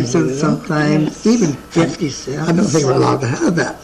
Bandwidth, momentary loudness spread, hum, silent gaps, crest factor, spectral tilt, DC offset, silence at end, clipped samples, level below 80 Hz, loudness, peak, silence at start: 13 kHz; 4 LU; none; none; 14 dB; -5.5 dB/octave; under 0.1%; 0 s; under 0.1%; -44 dBFS; -16 LUFS; 0 dBFS; 0 s